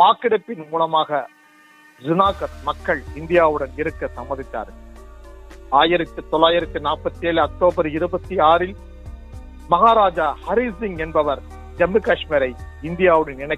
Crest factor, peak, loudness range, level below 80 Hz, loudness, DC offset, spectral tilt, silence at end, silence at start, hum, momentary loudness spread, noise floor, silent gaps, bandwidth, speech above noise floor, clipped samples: 20 dB; 0 dBFS; 3 LU; -40 dBFS; -19 LUFS; under 0.1%; -6.5 dB/octave; 0 s; 0 s; none; 15 LU; -50 dBFS; none; 11 kHz; 31 dB; under 0.1%